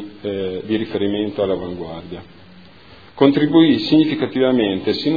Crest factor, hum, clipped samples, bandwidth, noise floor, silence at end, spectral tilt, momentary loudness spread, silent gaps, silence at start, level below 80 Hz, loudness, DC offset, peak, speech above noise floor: 18 dB; none; under 0.1%; 5 kHz; -44 dBFS; 0 s; -8 dB/octave; 17 LU; none; 0 s; -54 dBFS; -18 LUFS; 0.4%; 0 dBFS; 27 dB